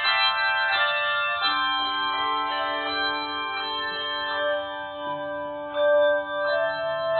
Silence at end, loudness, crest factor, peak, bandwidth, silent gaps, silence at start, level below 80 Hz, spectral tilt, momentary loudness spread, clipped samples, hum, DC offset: 0 s; -24 LUFS; 16 dB; -8 dBFS; 4.7 kHz; none; 0 s; -64 dBFS; -6 dB/octave; 10 LU; under 0.1%; none; under 0.1%